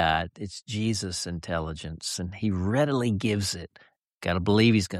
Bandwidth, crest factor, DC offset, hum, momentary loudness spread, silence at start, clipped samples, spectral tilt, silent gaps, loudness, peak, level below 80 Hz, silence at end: 13.5 kHz; 18 dB; under 0.1%; none; 13 LU; 0 s; under 0.1%; -5 dB/octave; 4.14-4.21 s; -27 LUFS; -10 dBFS; -48 dBFS; 0 s